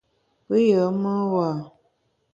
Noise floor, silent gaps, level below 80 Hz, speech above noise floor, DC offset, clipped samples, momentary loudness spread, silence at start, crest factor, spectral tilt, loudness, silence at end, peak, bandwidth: -69 dBFS; none; -66 dBFS; 48 dB; under 0.1%; under 0.1%; 8 LU; 0.5 s; 16 dB; -8.5 dB/octave; -22 LUFS; 0.65 s; -8 dBFS; 7.6 kHz